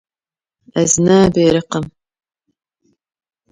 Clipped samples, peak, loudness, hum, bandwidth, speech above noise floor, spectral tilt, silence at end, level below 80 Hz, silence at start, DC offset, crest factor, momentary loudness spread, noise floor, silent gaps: under 0.1%; 0 dBFS; -14 LUFS; none; 10.5 kHz; over 77 dB; -5 dB/octave; 1.6 s; -46 dBFS; 0.75 s; under 0.1%; 16 dB; 13 LU; under -90 dBFS; none